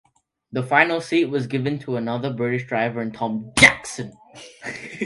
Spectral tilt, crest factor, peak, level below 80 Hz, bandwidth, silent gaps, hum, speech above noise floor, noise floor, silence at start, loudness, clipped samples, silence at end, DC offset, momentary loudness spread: -4 dB/octave; 22 dB; 0 dBFS; -50 dBFS; 11.5 kHz; none; none; 27 dB; -48 dBFS; 0.5 s; -20 LUFS; under 0.1%; 0 s; under 0.1%; 19 LU